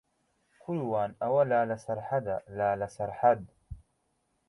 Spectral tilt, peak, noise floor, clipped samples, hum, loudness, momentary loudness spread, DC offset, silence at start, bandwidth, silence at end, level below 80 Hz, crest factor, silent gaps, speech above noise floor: -8 dB/octave; -10 dBFS; -76 dBFS; under 0.1%; none; -30 LUFS; 22 LU; under 0.1%; 0.7 s; 11.5 kHz; 0.7 s; -60 dBFS; 20 dB; none; 47 dB